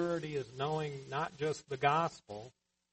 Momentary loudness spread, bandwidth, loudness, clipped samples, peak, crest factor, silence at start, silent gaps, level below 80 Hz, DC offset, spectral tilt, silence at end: 17 LU; 8.4 kHz; -36 LUFS; under 0.1%; -14 dBFS; 22 dB; 0 s; none; -70 dBFS; under 0.1%; -5.5 dB/octave; 0.45 s